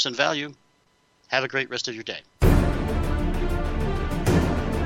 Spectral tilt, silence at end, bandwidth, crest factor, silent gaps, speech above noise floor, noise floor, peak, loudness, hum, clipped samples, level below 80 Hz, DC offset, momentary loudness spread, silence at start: -5.5 dB/octave; 0 s; 16.5 kHz; 20 dB; none; 37 dB; -64 dBFS; -4 dBFS; -25 LUFS; none; under 0.1%; -28 dBFS; under 0.1%; 9 LU; 0 s